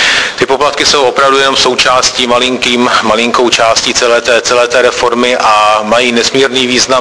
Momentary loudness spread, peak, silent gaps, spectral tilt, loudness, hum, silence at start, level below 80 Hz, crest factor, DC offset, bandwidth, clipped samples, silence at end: 2 LU; 0 dBFS; none; -1.5 dB/octave; -8 LUFS; none; 0 s; -40 dBFS; 8 dB; 0.3%; 11 kHz; 0.8%; 0 s